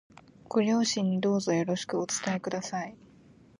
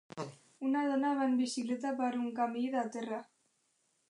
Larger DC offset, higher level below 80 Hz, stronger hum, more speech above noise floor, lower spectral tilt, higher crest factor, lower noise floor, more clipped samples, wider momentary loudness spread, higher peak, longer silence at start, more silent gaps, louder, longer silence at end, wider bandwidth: neither; first, -70 dBFS vs -88 dBFS; neither; second, 28 dB vs 43 dB; about the same, -4.5 dB/octave vs -4.5 dB/octave; about the same, 16 dB vs 14 dB; second, -57 dBFS vs -77 dBFS; neither; second, 8 LU vs 12 LU; first, -14 dBFS vs -22 dBFS; first, 0.5 s vs 0.15 s; neither; first, -29 LUFS vs -34 LUFS; second, 0.65 s vs 0.85 s; about the same, 11.5 kHz vs 11 kHz